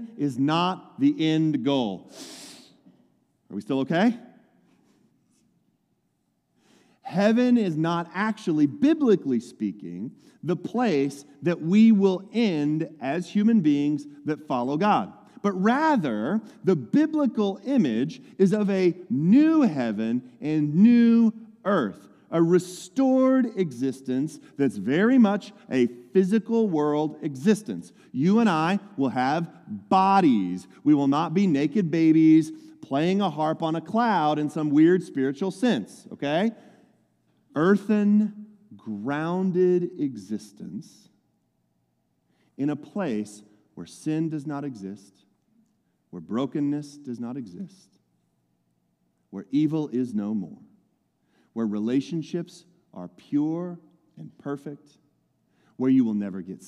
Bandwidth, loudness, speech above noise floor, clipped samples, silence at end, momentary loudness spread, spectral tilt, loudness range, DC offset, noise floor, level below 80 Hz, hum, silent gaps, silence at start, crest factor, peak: 11.5 kHz; -24 LUFS; 49 dB; under 0.1%; 0 s; 17 LU; -7 dB/octave; 11 LU; under 0.1%; -73 dBFS; -78 dBFS; none; none; 0 s; 18 dB; -8 dBFS